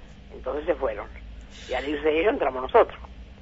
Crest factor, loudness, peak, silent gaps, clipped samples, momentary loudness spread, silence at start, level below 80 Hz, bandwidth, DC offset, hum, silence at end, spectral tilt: 20 dB; -25 LUFS; -6 dBFS; none; under 0.1%; 23 LU; 0 s; -44 dBFS; 8 kHz; under 0.1%; none; 0 s; -6 dB/octave